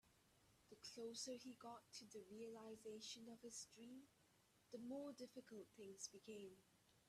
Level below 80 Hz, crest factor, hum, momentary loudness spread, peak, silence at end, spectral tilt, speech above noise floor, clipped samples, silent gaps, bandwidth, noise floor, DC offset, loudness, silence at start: under -90 dBFS; 20 dB; none; 8 LU; -38 dBFS; 0 s; -3 dB/octave; 21 dB; under 0.1%; none; 14 kHz; -78 dBFS; under 0.1%; -57 LUFS; 0.05 s